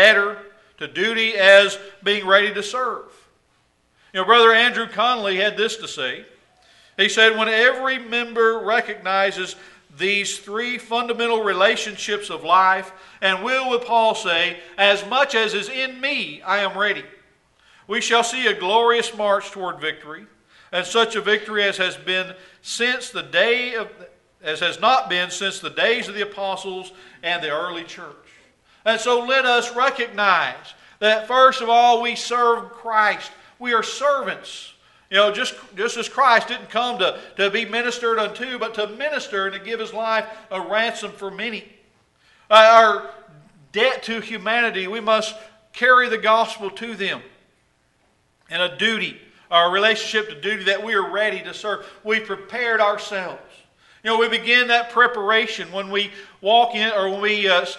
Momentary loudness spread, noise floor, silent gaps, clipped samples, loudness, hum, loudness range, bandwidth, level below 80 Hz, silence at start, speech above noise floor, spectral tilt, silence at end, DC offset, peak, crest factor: 14 LU; -63 dBFS; none; under 0.1%; -19 LUFS; none; 5 LU; 11.5 kHz; -68 dBFS; 0 s; 43 dB; -2 dB/octave; 0 s; under 0.1%; 0 dBFS; 20 dB